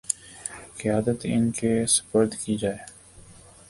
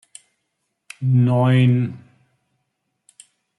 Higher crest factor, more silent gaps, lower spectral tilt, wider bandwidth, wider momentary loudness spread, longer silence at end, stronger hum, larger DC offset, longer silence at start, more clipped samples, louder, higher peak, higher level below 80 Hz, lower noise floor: first, 22 dB vs 14 dB; neither; second, -4.5 dB/octave vs -8 dB/octave; about the same, 11.5 kHz vs 11 kHz; first, 15 LU vs 11 LU; second, 0.35 s vs 1.6 s; neither; neither; second, 0.1 s vs 1 s; neither; second, -25 LUFS vs -18 LUFS; about the same, -4 dBFS vs -6 dBFS; first, -54 dBFS vs -62 dBFS; second, -49 dBFS vs -75 dBFS